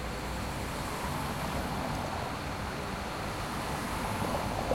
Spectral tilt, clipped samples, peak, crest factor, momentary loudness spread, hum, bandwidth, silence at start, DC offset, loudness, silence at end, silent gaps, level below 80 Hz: -4.5 dB/octave; under 0.1%; -16 dBFS; 18 dB; 4 LU; none; 16.5 kHz; 0 s; under 0.1%; -35 LUFS; 0 s; none; -44 dBFS